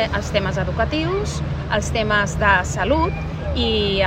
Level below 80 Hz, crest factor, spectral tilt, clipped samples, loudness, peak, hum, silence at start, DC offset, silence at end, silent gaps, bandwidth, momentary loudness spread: -30 dBFS; 16 dB; -5 dB/octave; under 0.1%; -20 LUFS; -2 dBFS; none; 0 s; under 0.1%; 0 s; none; 9.8 kHz; 7 LU